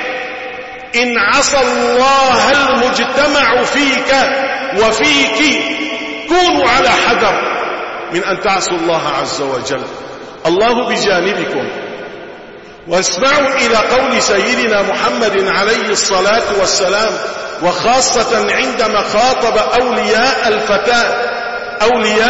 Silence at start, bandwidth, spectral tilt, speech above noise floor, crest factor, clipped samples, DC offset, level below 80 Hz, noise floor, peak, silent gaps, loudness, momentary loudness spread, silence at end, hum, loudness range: 0 s; 8 kHz; -2 dB/octave; 21 dB; 12 dB; under 0.1%; 0.5%; -42 dBFS; -33 dBFS; 0 dBFS; none; -12 LUFS; 10 LU; 0 s; none; 5 LU